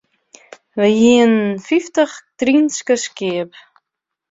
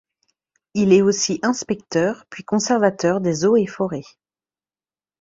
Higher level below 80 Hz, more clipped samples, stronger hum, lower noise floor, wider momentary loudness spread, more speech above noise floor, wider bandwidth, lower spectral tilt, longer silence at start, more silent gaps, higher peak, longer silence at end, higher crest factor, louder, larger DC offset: about the same, -60 dBFS vs -60 dBFS; neither; neither; second, -80 dBFS vs under -90 dBFS; about the same, 11 LU vs 11 LU; second, 65 dB vs over 71 dB; about the same, 7.8 kHz vs 7.8 kHz; about the same, -4.5 dB/octave vs -5 dB/octave; about the same, 0.75 s vs 0.75 s; neither; about the same, -2 dBFS vs -2 dBFS; second, 0.85 s vs 1.2 s; about the same, 16 dB vs 18 dB; first, -16 LUFS vs -19 LUFS; neither